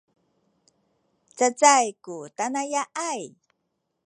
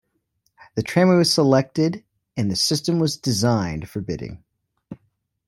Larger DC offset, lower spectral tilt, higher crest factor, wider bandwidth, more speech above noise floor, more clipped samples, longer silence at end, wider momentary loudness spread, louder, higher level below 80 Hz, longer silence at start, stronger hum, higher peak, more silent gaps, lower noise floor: neither; second, -1 dB/octave vs -5 dB/octave; first, 24 dB vs 18 dB; second, 11 kHz vs 16 kHz; first, 54 dB vs 50 dB; neither; first, 0.75 s vs 0.55 s; first, 20 LU vs 15 LU; second, -23 LUFS vs -20 LUFS; second, -88 dBFS vs -52 dBFS; first, 1.35 s vs 0.75 s; neither; about the same, -2 dBFS vs -4 dBFS; neither; first, -78 dBFS vs -70 dBFS